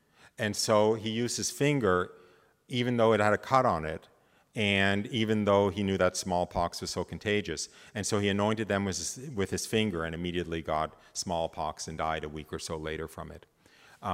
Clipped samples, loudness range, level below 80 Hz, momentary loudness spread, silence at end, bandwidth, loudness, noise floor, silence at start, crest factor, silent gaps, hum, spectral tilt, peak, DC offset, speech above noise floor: under 0.1%; 7 LU; -58 dBFS; 12 LU; 0 s; 16 kHz; -30 LUFS; -61 dBFS; 0.4 s; 22 dB; none; none; -4.5 dB/octave; -8 dBFS; under 0.1%; 31 dB